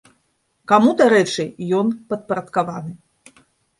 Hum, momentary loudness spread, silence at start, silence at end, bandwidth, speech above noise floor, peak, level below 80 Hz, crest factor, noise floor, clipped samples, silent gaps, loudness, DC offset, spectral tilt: none; 14 LU; 0.7 s; 0.85 s; 11.5 kHz; 49 dB; -2 dBFS; -64 dBFS; 18 dB; -67 dBFS; under 0.1%; none; -18 LUFS; under 0.1%; -5.5 dB/octave